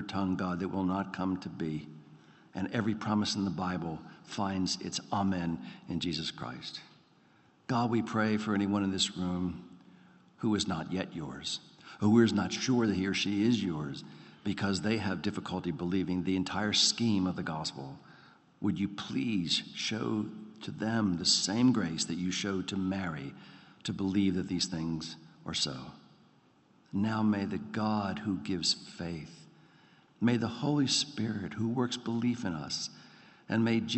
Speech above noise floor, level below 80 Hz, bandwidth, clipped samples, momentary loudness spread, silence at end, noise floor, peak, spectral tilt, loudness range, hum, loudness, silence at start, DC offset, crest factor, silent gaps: 33 dB; -68 dBFS; 8.4 kHz; under 0.1%; 13 LU; 0 s; -65 dBFS; -12 dBFS; -4.5 dB/octave; 5 LU; none; -32 LUFS; 0 s; under 0.1%; 20 dB; none